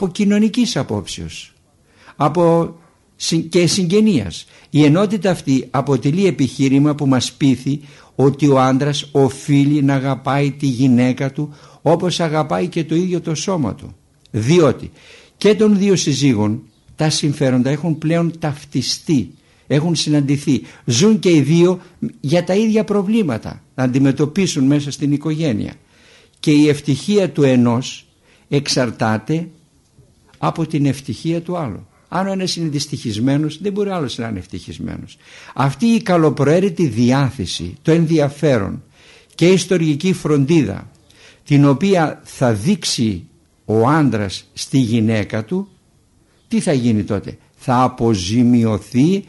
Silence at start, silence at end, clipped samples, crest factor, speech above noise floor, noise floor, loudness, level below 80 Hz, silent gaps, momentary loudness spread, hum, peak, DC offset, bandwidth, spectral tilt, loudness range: 0 s; 0.05 s; under 0.1%; 14 dB; 39 dB; -55 dBFS; -17 LUFS; -50 dBFS; none; 12 LU; none; -2 dBFS; under 0.1%; 11.5 kHz; -6 dB/octave; 5 LU